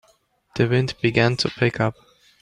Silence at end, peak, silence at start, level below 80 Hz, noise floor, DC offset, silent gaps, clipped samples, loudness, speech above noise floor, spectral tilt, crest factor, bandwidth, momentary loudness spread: 0.5 s; -2 dBFS; 0.55 s; -52 dBFS; -61 dBFS; under 0.1%; none; under 0.1%; -21 LUFS; 41 dB; -6 dB/octave; 20 dB; 10.5 kHz; 6 LU